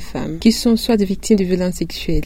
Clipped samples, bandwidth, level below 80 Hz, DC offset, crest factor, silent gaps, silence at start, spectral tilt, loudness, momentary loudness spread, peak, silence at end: under 0.1%; 16.5 kHz; -30 dBFS; under 0.1%; 16 dB; none; 0 s; -5.5 dB/octave; -17 LUFS; 7 LU; 0 dBFS; 0 s